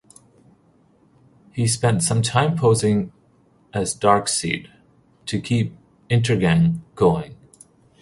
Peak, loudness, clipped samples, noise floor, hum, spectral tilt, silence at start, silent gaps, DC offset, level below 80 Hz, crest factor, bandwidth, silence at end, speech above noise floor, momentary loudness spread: -2 dBFS; -20 LUFS; under 0.1%; -57 dBFS; none; -5 dB/octave; 1.55 s; none; under 0.1%; -48 dBFS; 20 dB; 11.5 kHz; 0.7 s; 38 dB; 11 LU